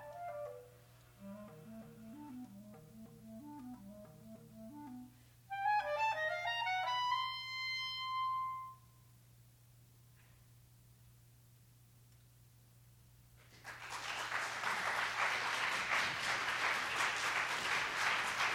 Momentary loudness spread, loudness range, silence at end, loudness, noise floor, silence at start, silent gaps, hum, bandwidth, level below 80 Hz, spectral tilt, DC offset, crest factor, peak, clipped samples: 20 LU; 18 LU; 0 s; -37 LUFS; -64 dBFS; 0 s; none; none; over 20 kHz; -74 dBFS; -1.5 dB/octave; under 0.1%; 22 dB; -20 dBFS; under 0.1%